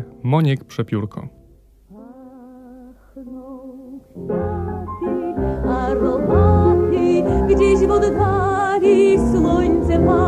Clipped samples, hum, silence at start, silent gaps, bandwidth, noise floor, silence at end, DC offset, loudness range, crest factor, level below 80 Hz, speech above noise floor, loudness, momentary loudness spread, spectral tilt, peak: under 0.1%; none; 0 s; none; 10 kHz; -49 dBFS; 0 s; under 0.1%; 16 LU; 12 dB; -30 dBFS; 34 dB; -17 LUFS; 21 LU; -8 dB/octave; -4 dBFS